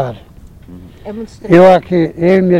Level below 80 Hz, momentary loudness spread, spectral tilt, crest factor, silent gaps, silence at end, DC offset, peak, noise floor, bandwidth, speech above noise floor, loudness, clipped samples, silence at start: -40 dBFS; 21 LU; -8.5 dB/octave; 12 dB; none; 0 s; under 0.1%; 0 dBFS; -35 dBFS; 10 kHz; 25 dB; -10 LUFS; 0.7%; 0 s